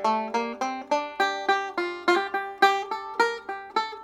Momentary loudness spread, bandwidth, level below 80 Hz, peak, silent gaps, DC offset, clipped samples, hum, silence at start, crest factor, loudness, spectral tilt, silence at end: 8 LU; 16.5 kHz; -74 dBFS; -4 dBFS; none; under 0.1%; under 0.1%; none; 0 s; 22 dB; -26 LUFS; -2.5 dB/octave; 0 s